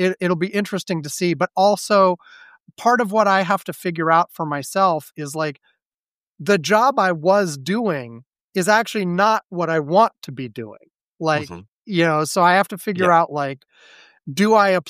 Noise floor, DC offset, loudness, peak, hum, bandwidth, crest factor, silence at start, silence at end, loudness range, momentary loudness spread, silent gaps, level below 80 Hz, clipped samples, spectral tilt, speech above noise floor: under -90 dBFS; under 0.1%; -19 LUFS; -2 dBFS; none; 15.5 kHz; 18 dB; 0 s; 0 s; 2 LU; 14 LU; 2.60-2.64 s, 5.85-6.35 s, 8.27-8.31 s, 8.41-8.48 s, 11.01-11.12 s, 11.68-11.85 s; -68 dBFS; under 0.1%; -5 dB/octave; over 71 dB